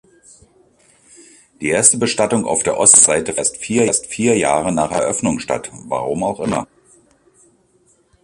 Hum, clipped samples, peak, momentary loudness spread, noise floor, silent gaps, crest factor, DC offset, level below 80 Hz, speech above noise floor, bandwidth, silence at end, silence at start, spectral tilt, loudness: none; under 0.1%; 0 dBFS; 14 LU; -57 dBFS; none; 18 dB; under 0.1%; -50 dBFS; 41 dB; 13.5 kHz; 1.6 s; 1.6 s; -3 dB/octave; -15 LUFS